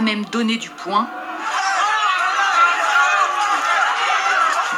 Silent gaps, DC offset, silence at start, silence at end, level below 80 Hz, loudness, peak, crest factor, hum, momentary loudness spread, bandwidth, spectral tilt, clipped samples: none; under 0.1%; 0 s; 0 s; -70 dBFS; -17 LUFS; -4 dBFS; 14 dB; none; 7 LU; 14.5 kHz; -2 dB/octave; under 0.1%